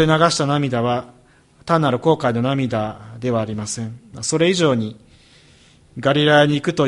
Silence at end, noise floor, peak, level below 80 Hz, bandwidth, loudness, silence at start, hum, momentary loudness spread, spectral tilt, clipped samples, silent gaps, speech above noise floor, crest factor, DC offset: 0 s; -51 dBFS; 0 dBFS; -52 dBFS; 11.5 kHz; -19 LUFS; 0 s; none; 13 LU; -5 dB/octave; under 0.1%; none; 34 dB; 18 dB; under 0.1%